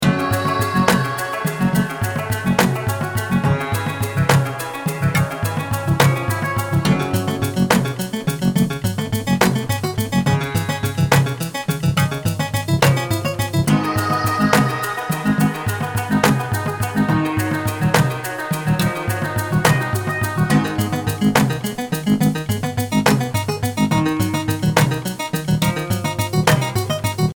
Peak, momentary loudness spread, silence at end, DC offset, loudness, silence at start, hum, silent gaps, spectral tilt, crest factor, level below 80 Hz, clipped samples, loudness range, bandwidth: 0 dBFS; 6 LU; 0.05 s; under 0.1%; -19 LUFS; 0 s; none; none; -5.5 dB/octave; 18 dB; -42 dBFS; under 0.1%; 1 LU; over 20 kHz